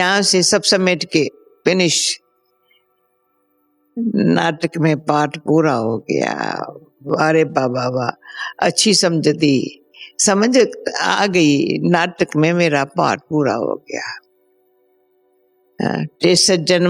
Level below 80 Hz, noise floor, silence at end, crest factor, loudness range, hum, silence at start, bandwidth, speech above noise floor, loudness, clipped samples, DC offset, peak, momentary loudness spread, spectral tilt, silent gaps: -64 dBFS; -64 dBFS; 0 s; 18 dB; 5 LU; none; 0 s; 14.5 kHz; 48 dB; -16 LUFS; under 0.1%; under 0.1%; 0 dBFS; 12 LU; -4 dB/octave; none